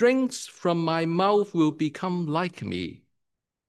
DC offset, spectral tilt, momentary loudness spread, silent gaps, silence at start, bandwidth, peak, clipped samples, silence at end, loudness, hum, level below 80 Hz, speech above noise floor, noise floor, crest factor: under 0.1%; -6 dB/octave; 10 LU; none; 0 s; 12.5 kHz; -10 dBFS; under 0.1%; 0.75 s; -26 LUFS; none; -70 dBFS; 58 dB; -83 dBFS; 16 dB